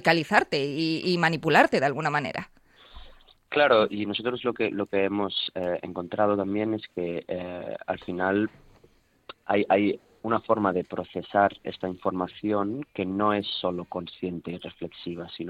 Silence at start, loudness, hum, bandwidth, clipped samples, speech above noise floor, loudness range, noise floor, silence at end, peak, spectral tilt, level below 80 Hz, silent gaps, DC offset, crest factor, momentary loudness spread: 0 s; -26 LUFS; none; 14 kHz; under 0.1%; 35 dB; 5 LU; -61 dBFS; 0 s; -6 dBFS; -6 dB/octave; -60 dBFS; none; under 0.1%; 22 dB; 14 LU